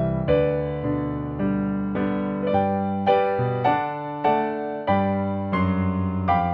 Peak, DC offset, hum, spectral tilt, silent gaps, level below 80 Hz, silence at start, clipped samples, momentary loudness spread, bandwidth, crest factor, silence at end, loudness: -8 dBFS; under 0.1%; none; -10.5 dB/octave; none; -44 dBFS; 0 s; under 0.1%; 5 LU; 5.2 kHz; 16 dB; 0 s; -23 LUFS